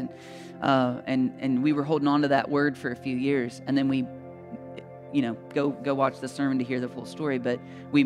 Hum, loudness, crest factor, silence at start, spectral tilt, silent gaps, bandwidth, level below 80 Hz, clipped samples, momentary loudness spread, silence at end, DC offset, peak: none; -27 LUFS; 18 dB; 0 s; -7 dB/octave; none; 11 kHz; -70 dBFS; under 0.1%; 17 LU; 0 s; under 0.1%; -8 dBFS